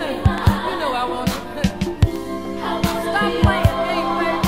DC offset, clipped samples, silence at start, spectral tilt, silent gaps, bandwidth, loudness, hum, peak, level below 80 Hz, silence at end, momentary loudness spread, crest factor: 1%; under 0.1%; 0 s; -6 dB/octave; none; 16 kHz; -20 LUFS; 50 Hz at -40 dBFS; 0 dBFS; -30 dBFS; 0 s; 7 LU; 18 dB